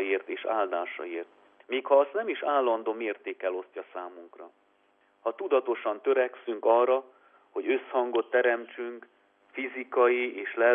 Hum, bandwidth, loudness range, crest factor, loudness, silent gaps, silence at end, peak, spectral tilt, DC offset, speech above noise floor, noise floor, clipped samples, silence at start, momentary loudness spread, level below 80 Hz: none; 3.7 kHz; 5 LU; 20 dB; -28 LUFS; none; 0 s; -10 dBFS; -6.5 dB/octave; under 0.1%; 39 dB; -67 dBFS; under 0.1%; 0 s; 15 LU; under -90 dBFS